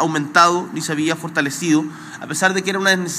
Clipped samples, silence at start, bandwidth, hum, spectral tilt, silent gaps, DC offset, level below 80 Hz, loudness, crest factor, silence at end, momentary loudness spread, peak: under 0.1%; 0 s; 15.5 kHz; none; -3.5 dB/octave; none; under 0.1%; -72 dBFS; -18 LUFS; 18 dB; 0 s; 10 LU; 0 dBFS